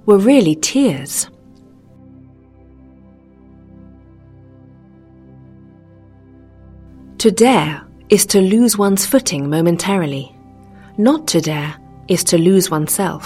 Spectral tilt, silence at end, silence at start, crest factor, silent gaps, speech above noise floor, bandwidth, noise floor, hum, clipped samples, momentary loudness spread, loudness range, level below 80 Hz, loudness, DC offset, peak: -4.5 dB/octave; 0 s; 0.05 s; 16 dB; none; 31 dB; 16 kHz; -45 dBFS; none; under 0.1%; 12 LU; 9 LU; -50 dBFS; -14 LUFS; under 0.1%; 0 dBFS